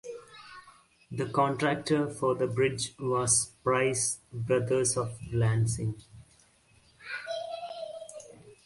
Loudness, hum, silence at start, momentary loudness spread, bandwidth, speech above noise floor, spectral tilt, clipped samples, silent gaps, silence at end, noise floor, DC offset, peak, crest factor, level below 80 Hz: -29 LUFS; none; 0.05 s; 20 LU; 11.5 kHz; 34 dB; -4.5 dB/octave; under 0.1%; none; 0.1 s; -63 dBFS; under 0.1%; -12 dBFS; 20 dB; -58 dBFS